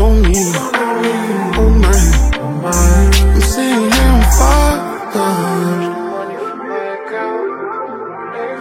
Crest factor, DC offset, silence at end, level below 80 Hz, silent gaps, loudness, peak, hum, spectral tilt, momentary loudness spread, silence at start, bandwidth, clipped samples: 12 dB; under 0.1%; 0 s; -14 dBFS; none; -14 LUFS; 0 dBFS; none; -5 dB/octave; 12 LU; 0 s; 16 kHz; under 0.1%